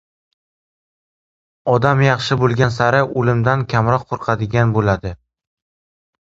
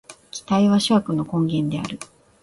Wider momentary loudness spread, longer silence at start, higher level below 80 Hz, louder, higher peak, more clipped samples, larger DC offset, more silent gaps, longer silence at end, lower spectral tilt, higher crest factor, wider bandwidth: second, 6 LU vs 18 LU; first, 1.65 s vs 0.1 s; first, -44 dBFS vs -56 dBFS; first, -17 LUFS vs -21 LUFS; first, 0 dBFS vs -6 dBFS; neither; neither; neither; first, 1.25 s vs 0.35 s; about the same, -7 dB/octave vs -6 dB/octave; about the same, 18 dB vs 16 dB; second, 7.8 kHz vs 11.5 kHz